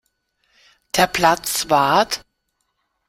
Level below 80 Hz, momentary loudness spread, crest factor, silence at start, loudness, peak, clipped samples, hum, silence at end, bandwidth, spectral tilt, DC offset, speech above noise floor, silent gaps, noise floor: -52 dBFS; 8 LU; 20 dB; 0.95 s; -18 LUFS; -2 dBFS; under 0.1%; none; 0.9 s; 16.5 kHz; -2.5 dB/octave; under 0.1%; 55 dB; none; -72 dBFS